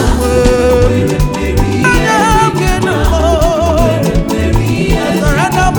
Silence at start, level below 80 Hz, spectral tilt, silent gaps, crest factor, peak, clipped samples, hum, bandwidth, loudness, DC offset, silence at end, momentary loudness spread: 0 s; -16 dBFS; -5.5 dB/octave; none; 10 dB; 0 dBFS; under 0.1%; none; over 20 kHz; -11 LUFS; under 0.1%; 0 s; 4 LU